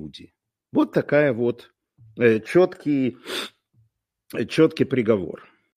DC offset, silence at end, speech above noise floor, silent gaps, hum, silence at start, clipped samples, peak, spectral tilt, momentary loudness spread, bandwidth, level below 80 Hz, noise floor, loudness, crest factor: under 0.1%; 0.4 s; 46 dB; none; none; 0 s; under 0.1%; -4 dBFS; -6.5 dB/octave; 15 LU; 15.5 kHz; -62 dBFS; -67 dBFS; -22 LUFS; 18 dB